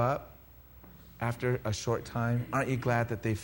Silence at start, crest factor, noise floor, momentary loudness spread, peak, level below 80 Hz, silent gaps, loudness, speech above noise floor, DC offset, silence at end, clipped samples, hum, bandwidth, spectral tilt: 0 s; 18 dB; -54 dBFS; 22 LU; -14 dBFS; -54 dBFS; none; -32 LUFS; 23 dB; under 0.1%; 0 s; under 0.1%; none; 16 kHz; -6.5 dB/octave